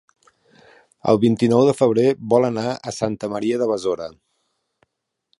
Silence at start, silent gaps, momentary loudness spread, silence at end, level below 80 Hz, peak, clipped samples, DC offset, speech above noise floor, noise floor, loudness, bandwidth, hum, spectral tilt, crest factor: 1.05 s; none; 10 LU; 1.3 s; -58 dBFS; -2 dBFS; under 0.1%; under 0.1%; 55 dB; -73 dBFS; -19 LUFS; 11.5 kHz; none; -6.5 dB/octave; 18 dB